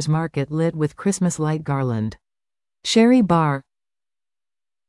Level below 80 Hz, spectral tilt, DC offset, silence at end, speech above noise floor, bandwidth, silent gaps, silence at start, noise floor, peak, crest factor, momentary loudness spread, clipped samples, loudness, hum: -54 dBFS; -6 dB/octave; under 0.1%; 1.25 s; over 71 dB; 12 kHz; none; 0 s; under -90 dBFS; -4 dBFS; 16 dB; 11 LU; under 0.1%; -20 LUFS; none